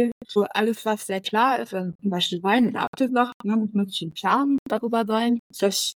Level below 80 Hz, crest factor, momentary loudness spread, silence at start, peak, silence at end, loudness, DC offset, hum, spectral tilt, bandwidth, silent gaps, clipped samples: -68 dBFS; 18 dB; 6 LU; 0 s; -6 dBFS; 0.05 s; -23 LUFS; under 0.1%; none; -4.5 dB/octave; 19.5 kHz; 0.12-0.21 s, 1.95-1.99 s, 2.87-2.93 s, 3.34-3.40 s, 4.59-4.66 s, 5.39-5.50 s; under 0.1%